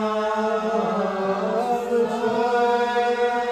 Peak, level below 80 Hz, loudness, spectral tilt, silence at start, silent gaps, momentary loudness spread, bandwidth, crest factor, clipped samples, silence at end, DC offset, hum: -10 dBFS; -60 dBFS; -22 LUFS; -5.5 dB/octave; 0 s; none; 3 LU; 13 kHz; 12 dB; under 0.1%; 0 s; under 0.1%; none